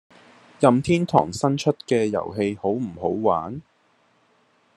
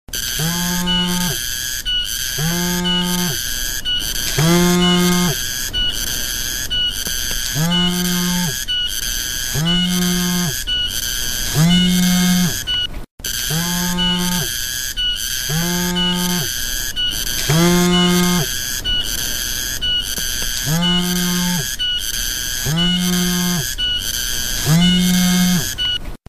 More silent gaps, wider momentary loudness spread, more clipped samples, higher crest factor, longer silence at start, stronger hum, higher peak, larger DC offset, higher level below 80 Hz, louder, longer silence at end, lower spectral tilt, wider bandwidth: second, none vs 13.11-13.18 s; about the same, 7 LU vs 6 LU; neither; first, 22 dB vs 16 dB; first, 0.6 s vs 0.1 s; neither; about the same, -2 dBFS vs -2 dBFS; second, under 0.1% vs 0.4%; second, -58 dBFS vs -30 dBFS; second, -22 LUFS vs -17 LUFS; first, 1.15 s vs 0.1 s; first, -6.5 dB/octave vs -3 dB/octave; second, 12.5 kHz vs 15 kHz